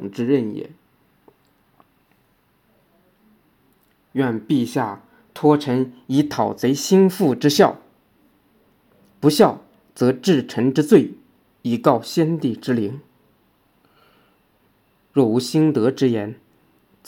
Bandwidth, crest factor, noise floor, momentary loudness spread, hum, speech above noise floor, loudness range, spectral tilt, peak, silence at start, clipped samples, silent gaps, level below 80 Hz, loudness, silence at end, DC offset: 17.5 kHz; 20 dB; -62 dBFS; 14 LU; none; 44 dB; 8 LU; -6 dB/octave; 0 dBFS; 0 s; under 0.1%; none; -68 dBFS; -19 LUFS; 0.75 s; under 0.1%